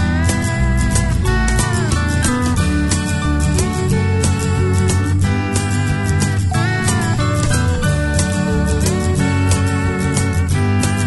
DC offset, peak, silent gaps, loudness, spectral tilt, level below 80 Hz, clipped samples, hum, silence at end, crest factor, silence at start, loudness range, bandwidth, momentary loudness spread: 0.1%; -2 dBFS; none; -16 LUFS; -5 dB/octave; -24 dBFS; under 0.1%; none; 0 s; 14 dB; 0 s; 0 LU; 12 kHz; 1 LU